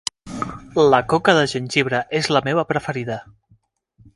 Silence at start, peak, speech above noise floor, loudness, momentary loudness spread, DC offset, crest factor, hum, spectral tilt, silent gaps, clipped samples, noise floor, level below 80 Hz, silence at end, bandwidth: 0.25 s; 0 dBFS; 40 dB; -19 LUFS; 14 LU; under 0.1%; 20 dB; none; -4.5 dB/octave; none; under 0.1%; -59 dBFS; -52 dBFS; 0.95 s; 11.5 kHz